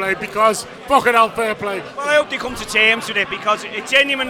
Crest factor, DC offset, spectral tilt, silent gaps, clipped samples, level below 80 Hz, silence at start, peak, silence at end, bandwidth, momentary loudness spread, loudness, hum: 18 dB; under 0.1%; -2.5 dB/octave; none; under 0.1%; -50 dBFS; 0 s; 0 dBFS; 0 s; 19 kHz; 10 LU; -17 LUFS; none